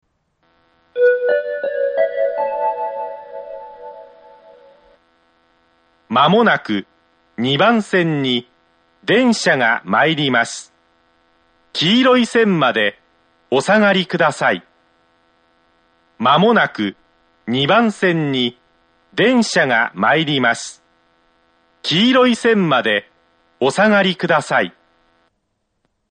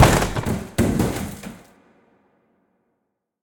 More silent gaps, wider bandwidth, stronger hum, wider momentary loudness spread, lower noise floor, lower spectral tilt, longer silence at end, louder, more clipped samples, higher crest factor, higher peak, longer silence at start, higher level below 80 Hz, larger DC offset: neither; second, 9.4 kHz vs 19 kHz; neither; second, 13 LU vs 16 LU; second, -70 dBFS vs -76 dBFS; about the same, -4.5 dB/octave vs -5 dB/octave; second, 1.4 s vs 1.85 s; first, -16 LUFS vs -22 LUFS; neither; about the same, 18 dB vs 22 dB; about the same, 0 dBFS vs 0 dBFS; first, 0.95 s vs 0 s; second, -62 dBFS vs -34 dBFS; neither